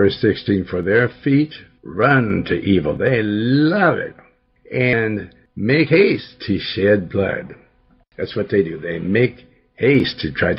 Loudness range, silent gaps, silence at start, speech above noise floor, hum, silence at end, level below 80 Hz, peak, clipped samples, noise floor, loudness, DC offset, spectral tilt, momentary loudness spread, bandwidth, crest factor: 3 LU; none; 0 s; 38 dB; none; 0 s; -50 dBFS; -2 dBFS; under 0.1%; -56 dBFS; -18 LUFS; under 0.1%; -9.5 dB/octave; 11 LU; 5.8 kHz; 16 dB